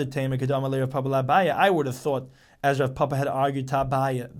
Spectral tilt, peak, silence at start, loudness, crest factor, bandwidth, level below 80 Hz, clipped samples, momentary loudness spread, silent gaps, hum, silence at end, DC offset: -6.5 dB/octave; -8 dBFS; 0 s; -24 LUFS; 16 dB; 16 kHz; -52 dBFS; under 0.1%; 6 LU; none; none; 0 s; under 0.1%